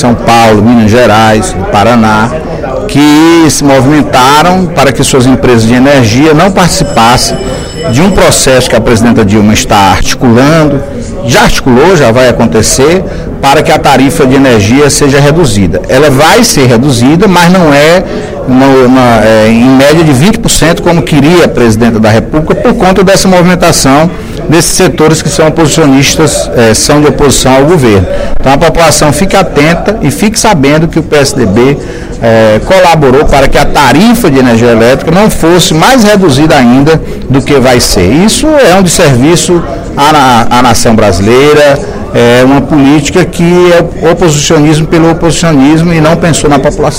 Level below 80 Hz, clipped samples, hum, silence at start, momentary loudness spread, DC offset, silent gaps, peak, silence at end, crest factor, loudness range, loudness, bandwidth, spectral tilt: -20 dBFS; 10%; none; 0 s; 5 LU; under 0.1%; none; 0 dBFS; 0 s; 4 dB; 1 LU; -4 LUFS; over 20 kHz; -5 dB/octave